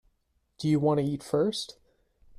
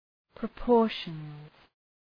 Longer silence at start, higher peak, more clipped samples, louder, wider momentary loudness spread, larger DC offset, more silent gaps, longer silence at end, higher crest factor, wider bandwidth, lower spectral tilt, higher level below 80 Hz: first, 0.6 s vs 0.4 s; about the same, -14 dBFS vs -12 dBFS; neither; about the same, -28 LUFS vs -29 LUFS; second, 10 LU vs 20 LU; neither; neither; about the same, 0.75 s vs 0.7 s; about the same, 16 dB vs 18 dB; first, 14 kHz vs 5.2 kHz; second, -6.5 dB/octave vs -8 dB/octave; second, -64 dBFS vs -52 dBFS